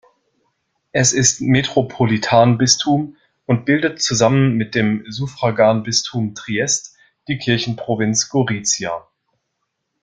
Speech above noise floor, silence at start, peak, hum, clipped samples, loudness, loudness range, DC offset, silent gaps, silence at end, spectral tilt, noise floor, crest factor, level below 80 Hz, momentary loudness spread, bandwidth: 57 dB; 0.95 s; 0 dBFS; none; under 0.1%; -17 LUFS; 4 LU; under 0.1%; none; 1.05 s; -4 dB/octave; -74 dBFS; 18 dB; -52 dBFS; 10 LU; 10 kHz